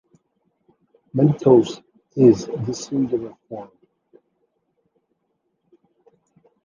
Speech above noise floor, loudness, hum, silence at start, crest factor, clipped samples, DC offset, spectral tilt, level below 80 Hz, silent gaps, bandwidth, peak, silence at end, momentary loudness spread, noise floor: 55 dB; -19 LUFS; none; 1.15 s; 20 dB; under 0.1%; under 0.1%; -8 dB/octave; -60 dBFS; none; 7.4 kHz; -2 dBFS; 3 s; 21 LU; -73 dBFS